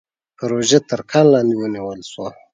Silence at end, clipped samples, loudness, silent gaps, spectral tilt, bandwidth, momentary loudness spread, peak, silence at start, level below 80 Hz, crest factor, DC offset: 0.25 s; under 0.1%; -16 LUFS; none; -5 dB/octave; 9.6 kHz; 16 LU; 0 dBFS; 0.4 s; -60 dBFS; 18 dB; under 0.1%